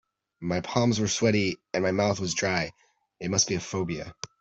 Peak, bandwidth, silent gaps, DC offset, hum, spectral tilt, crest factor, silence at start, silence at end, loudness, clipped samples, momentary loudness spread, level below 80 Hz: -6 dBFS; 8.2 kHz; none; under 0.1%; none; -4 dB/octave; 22 dB; 0.4 s; 0.15 s; -27 LUFS; under 0.1%; 11 LU; -58 dBFS